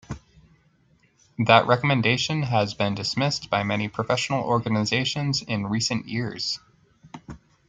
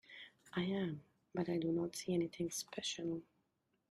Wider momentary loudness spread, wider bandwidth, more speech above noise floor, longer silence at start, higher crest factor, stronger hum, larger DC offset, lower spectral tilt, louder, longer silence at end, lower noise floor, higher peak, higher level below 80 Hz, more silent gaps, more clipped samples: first, 12 LU vs 9 LU; second, 9.4 kHz vs 14.5 kHz; second, 39 dB vs 43 dB; about the same, 0.1 s vs 0.1 s; first, 24 dB vs 16 dB; neither; neither; about the same, -4.5 dB/octave vs -5 dB/octave; first, -23 LUFS vs -41 LUFS; second, 0.3 s vs 0.7 s; second, -62 dBFS vs -83 dBFS; first, -2 dBFS vs -26 dBFS; first, -56 dBFS vs -76 dBFS; neither; neither